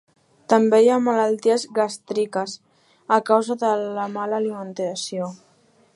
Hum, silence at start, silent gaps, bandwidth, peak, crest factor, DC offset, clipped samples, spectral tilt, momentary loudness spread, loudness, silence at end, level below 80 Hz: none; 0.5 s; none; 11.5 kHz; -2 dBFS; 20 dB; under 0.1%; under 0.1%; -4.5 dB/octave; 12 LU; -21 LUFS; 0.6 s; -78 dBFS